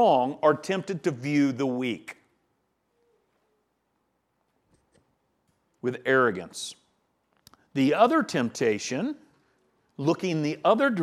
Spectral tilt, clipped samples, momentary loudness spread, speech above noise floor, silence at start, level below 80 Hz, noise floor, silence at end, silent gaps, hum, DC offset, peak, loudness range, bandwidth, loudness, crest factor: -5.5 dB/octave; under 0.1%; 13 LU; 50 dB; 0 s; -76 dBFS; -75 dBFS; 0 s; none; none; under 0.1%; -6 dBFS; 10 LU; 13.5 kHz; -26 LUFS; 22 dB